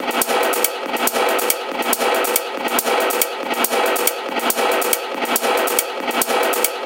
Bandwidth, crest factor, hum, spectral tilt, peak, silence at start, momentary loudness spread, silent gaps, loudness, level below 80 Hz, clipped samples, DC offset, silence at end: 18 kHz; 20 dB; none; 0 dB/octave; 0 dBFS; 0 s; 3 LU; none; -18 LUFS; -68 dBFS; under 0.1%; under 0.1%; 0 s